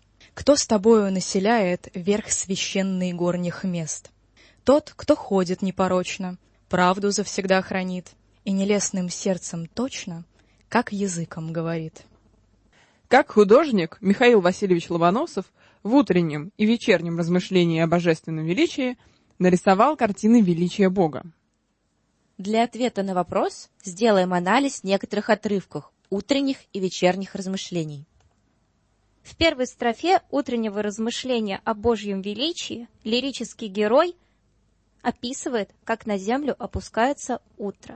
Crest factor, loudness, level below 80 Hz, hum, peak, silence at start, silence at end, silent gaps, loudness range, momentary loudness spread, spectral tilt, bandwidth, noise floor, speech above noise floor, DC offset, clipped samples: 18 dB; -23 LUFS; -54 dBFS; none; -4 dBFS; 0.35 s; 0 s; none; 7 LU; 13 LU; -5 dB/octave; 8.8 kHz; -70 dBFS; 48 dB; under 0.1%; under 0.1%